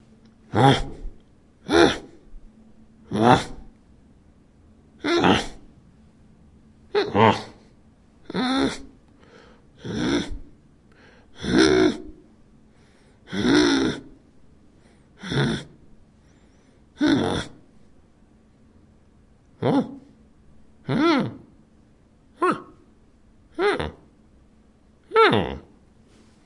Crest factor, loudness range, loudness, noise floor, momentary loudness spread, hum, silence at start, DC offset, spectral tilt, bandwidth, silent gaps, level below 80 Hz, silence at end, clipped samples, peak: 24 dB; 6 LU; -22 LUFS; -56 dBFS; 20 LU; none; 0.55 s; under 0.1%; -5.5 dB/octave; 11.5 kHz; none; -46 dBFS; 0.85 s; under 0.1%; -2 dBFS